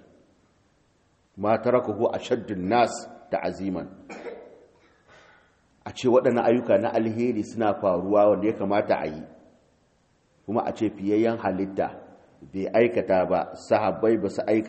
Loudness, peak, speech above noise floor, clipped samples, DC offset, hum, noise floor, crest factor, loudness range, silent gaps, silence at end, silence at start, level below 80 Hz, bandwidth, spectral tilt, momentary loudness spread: -24 LUFS; -6 dBFS; 41 dB; under 0.1%; under 0.1%; none; -65 dBFS; 18 dB; 6 LU; none; 0 s; 1.35 s; -64 dBFS; 8.4 kHz; -6.5 dB/octave; 17 LU